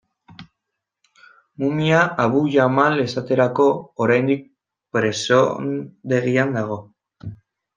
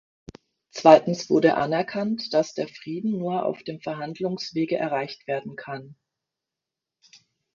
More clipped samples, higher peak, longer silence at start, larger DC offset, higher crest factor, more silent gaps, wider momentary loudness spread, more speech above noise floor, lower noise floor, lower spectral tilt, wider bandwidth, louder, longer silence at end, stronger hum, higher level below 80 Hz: neither; about the same, -2 dBFS vs -2 dBFS; second, 0.3 s vs 0.75 s; neither; second, 18 dB vs 24 dB; neither; second, 12 LU vs 16 LU; about the same, 62 dB vs 64 dB; second, -81 dBFS vs -87 dBFS; about the same, -6 dB/octave vs -6 dB/octave; first, 9.8 kHz vs 7.4 kHz; first, -19 LUFS vs -24 LUFS; second, 0.4 s vs 1.6 s; neither; about the same, -62 dBFS vs -64 dBFS